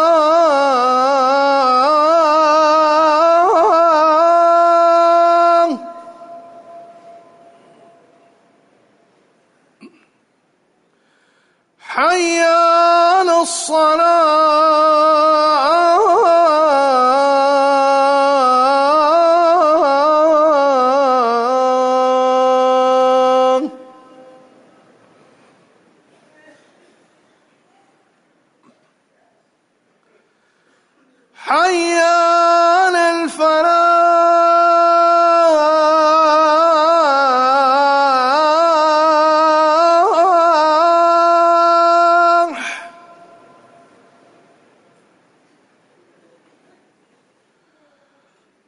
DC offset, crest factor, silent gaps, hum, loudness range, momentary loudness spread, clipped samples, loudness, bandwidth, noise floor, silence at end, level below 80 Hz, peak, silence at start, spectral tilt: under 0.1%; 10 dB; none; none; 7 LU; 3 LU; under 0.1%; -12 LUFS; 11 kHz; -62 dBFS; 5.8 s; -66 dBFS; -4 dBFS; 0 s; -1.5 dB/octave